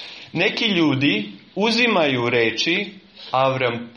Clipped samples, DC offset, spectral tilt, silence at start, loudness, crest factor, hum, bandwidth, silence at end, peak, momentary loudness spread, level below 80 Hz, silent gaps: under 0.1%; under 0.1%; -5 dB/octave; 0 s; -19 LUFS; 16 dB; none; 9.6 kHz; 0.05 s; -4 dBFS; 10 LU; -62 dBFS; none